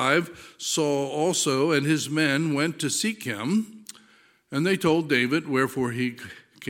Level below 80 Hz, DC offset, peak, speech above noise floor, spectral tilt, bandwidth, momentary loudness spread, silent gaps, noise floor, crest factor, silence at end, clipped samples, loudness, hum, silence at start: -68 dBFS; under 0.1%; -6 dBFS; 34 dB; -4 dB/octave; 17 kHz; 11 LU; none; -58 dBFS; 18 dB; 0 s; under 0.1%; -24 LUFS; none; 0 s